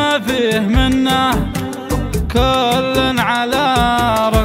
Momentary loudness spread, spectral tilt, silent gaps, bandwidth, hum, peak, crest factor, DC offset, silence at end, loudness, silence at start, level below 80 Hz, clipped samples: 6 LU; -5 dB/octave; none; 16.5 kHz; none; 0 dBFS; 14 dB; under 0.1%; 0 s; -15 LUFS; 0 s; -26 dBFS; under 0.1%